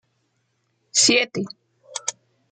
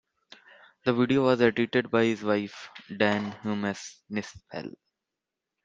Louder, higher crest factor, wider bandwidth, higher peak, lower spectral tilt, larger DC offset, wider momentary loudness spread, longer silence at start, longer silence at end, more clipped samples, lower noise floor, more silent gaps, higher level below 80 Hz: first, -20 LUFS vs -27 LUFS; about the same, 20 dB vs 22 dB; first, 10.5 kHz vs 7.8 kHz; about the same, -6 dBFS vs -6 dBFS; second, -1 dB/octave vs -6 dB/octave; neither; about the same, 18 LU vs 16 LU; about the same, 0.95 s vs 0.85 s; second, 0.4 s vs 0.95 s; neither; second, -70 dBFS vs -87 dBFS; neither; second, -74 dBFS vs -68 dBFS